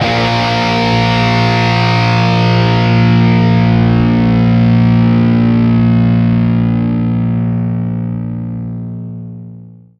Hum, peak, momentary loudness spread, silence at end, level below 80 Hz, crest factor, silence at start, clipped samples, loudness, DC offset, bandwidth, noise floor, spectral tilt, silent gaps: none; 0 dBFS; 12 LU; 0.3 s; -32 dBFS; 12 dB; 0 s; under 0.1%; -11 LUFS; under 0.1%; 6.8 kHz; -34 dBFS; -7.5 dB/octave; none